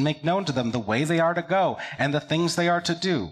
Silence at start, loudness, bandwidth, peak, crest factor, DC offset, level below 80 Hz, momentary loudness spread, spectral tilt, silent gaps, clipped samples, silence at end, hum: 0 s; -24 LUFS; 14 kHz; -10 dBFS; 14 dB; under 0.1%; -60 dBFS; 4 LU; -5 dB/octave; none; under 0.1%; 0 s; none